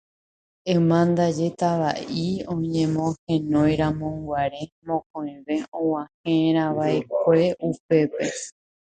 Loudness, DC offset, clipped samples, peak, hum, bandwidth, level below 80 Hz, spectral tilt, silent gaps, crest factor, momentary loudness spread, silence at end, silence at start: -23 LUFS; under 0.1%; under 0.1%; -6 dBFS; none; 9.2 kHz; -52 dBFS; -6.5 dB/octave; 3.19-3.27 s, 4.72-4.82 s, 5.06-5.14 s, 5.68-5.72 s, 6.14-6.24 s, 7.80-7.89 s; 18 dB; 9 LU; 0.4 s; 0.65 s